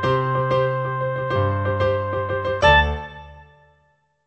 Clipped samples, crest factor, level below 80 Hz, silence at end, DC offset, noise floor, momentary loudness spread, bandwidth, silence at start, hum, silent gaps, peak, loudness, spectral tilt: under 0.1%; 18 dB; -34 dBFS; 0.85 s; under 0.1%; -63 dBFS; 10 LU; 8.4 kHz; 0 s; none; none; -4 dBFS; -20 LUFS; -6.5 dB/octave